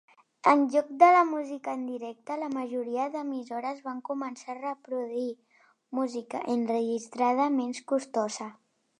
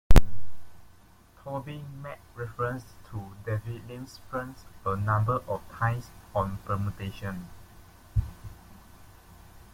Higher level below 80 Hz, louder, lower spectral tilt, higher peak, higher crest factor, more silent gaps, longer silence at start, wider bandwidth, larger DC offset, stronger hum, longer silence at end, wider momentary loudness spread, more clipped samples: second, -86 dBFS vs -32 dBFS; first, -29 LUFS vs -33 LUFS; second, -4.5 dB/octave vs -6.5 dB/octave; second, -6 dBFS vs -2 dBFS; about the same, 22 dB vs 22 dB; neither; first, 0.45 s vs 0.1 s; second, 11 kHz vs 16 kHz; neither; neither; second, 0.45 s vs 1.25 s; second, 14 LU vs 26 LU; neither